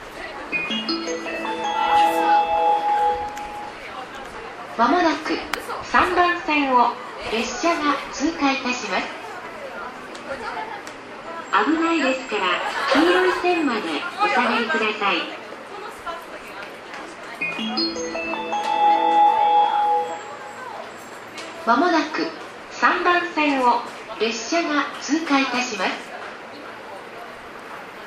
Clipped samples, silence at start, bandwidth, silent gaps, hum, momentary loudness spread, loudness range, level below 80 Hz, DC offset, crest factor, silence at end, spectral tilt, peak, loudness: under 0.1%; 0 s; 15.5 kHz; none; none; 17 LU; 6 LU; -56 dBFS; under 0.1%; 20 dB; 0 s; -3 dB/octave; -2 dBFS; -21 LUFS